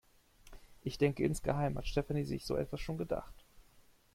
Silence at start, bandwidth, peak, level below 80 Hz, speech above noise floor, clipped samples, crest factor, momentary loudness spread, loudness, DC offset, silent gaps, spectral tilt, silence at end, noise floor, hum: 0.45 s; 16 kHz; -16 dBFS; -50 dBFS; 29 dB; under 0.1%; 20 dB; 8 LU; -37 LUFS; under 0.1%; none; -6.5 dB/octave; 0.35 s; -64 dBFS; none